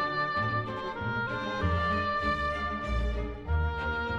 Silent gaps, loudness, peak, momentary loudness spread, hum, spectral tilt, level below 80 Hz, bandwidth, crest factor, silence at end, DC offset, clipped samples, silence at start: none; -31 LUFS; -16 dBFS; 5 LU; none; -6.5 dB/octave; -38 dBFS; 8.2 kHz; 14 dB; 0 s; under 0.1%; under 0.1%; 0 s